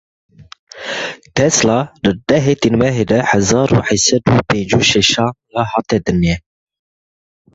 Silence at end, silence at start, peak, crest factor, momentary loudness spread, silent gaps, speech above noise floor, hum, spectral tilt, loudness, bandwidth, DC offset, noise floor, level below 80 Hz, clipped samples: 1.15 s; 0.4 s; 0 dBFS; 16 dB; 9 LU; 0.59-0.67 s; over 76 dB; none; -4 dB/octave; -14 LUFS; 8.2 kHz; under 0.1%; under -90 dBFS; -38 dBFS; under 0.1%